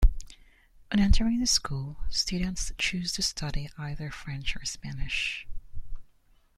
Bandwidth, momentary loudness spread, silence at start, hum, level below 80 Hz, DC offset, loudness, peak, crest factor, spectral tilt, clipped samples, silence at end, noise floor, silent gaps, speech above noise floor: 14 kHz; 14 LU; 0 s; none; -32 dBFS; under 0.1%; -29 LUFS; -8 dBFS; 20 dB; -3.5 dB/octave; under 0.1%; 0.55 s; -61 dBFS; none; 34 dB